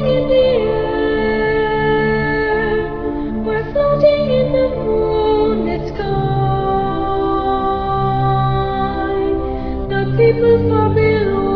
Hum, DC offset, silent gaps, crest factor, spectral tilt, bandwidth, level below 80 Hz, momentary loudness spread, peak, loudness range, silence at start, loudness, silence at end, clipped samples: none; under 0.1%; none; 14 dB; -9.5 dB/octave; 5.4 kHz; -30 dBFS; 7 LU; -2 dBFS; 2 LU; 0 s; -16 LUFS; 0 s; under 0.1%